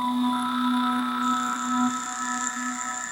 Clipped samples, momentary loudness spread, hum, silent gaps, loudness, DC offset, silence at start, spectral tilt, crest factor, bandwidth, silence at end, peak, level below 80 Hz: under 0.1%; 5 LU; none; none; -26 LUFS; under 0.1%; 0 s; -1.5 dB/octave; 16 dB; 17.5 kHz; 0 s; -10 dBFS; -72 dBFS